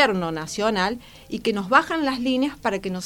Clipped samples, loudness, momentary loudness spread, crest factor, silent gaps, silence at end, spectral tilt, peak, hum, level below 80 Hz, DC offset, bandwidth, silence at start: under 0.1%; -23 LUFS; 9 LU; 20 dB; none; 0 s; -4.5 dB/octave; -2 dBFS; none; -52 dBFS; under 0.1%; 18 kHz; 0 s